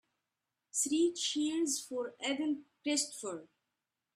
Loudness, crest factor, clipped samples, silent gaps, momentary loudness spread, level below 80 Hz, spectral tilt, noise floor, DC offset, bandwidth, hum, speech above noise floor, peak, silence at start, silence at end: -34 LUFS; 18 dB; under 0.1%; none; 10 LU; -84 dBFS; -1 dB/octave; -88 dBFS; under 0.1%; 14.5 kHz; none; 54 dB; -18 dBFS; 0.75 s; 0.7 s